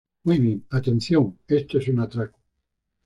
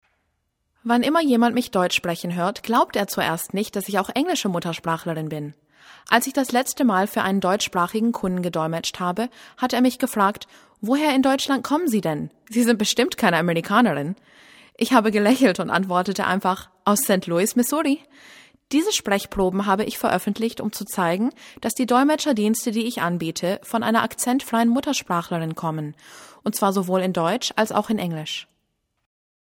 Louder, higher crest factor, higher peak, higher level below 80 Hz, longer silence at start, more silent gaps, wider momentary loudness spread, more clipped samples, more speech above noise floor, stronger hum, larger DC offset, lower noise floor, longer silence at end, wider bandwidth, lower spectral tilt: about the same, -23 LUFS vs -22 LUFS; second, 14 dB vs 22 dB; second, -8 dBFS vs 0 dBFS; about the same, -54 dBFS vs -56 dBFS; second, 0.25 s vs 0.85 s; neither; about the same, 7 LU vs 9 LU; neither; first, 56 dB vs 52 dB; neither; neither; first, -78 dBFS vs -73 dBFS; second, 0.8 s vs 1.05 s; second, 10.5 kHz vs 18 kHz; first, -8 dB/octave vs -4.5 dB/octave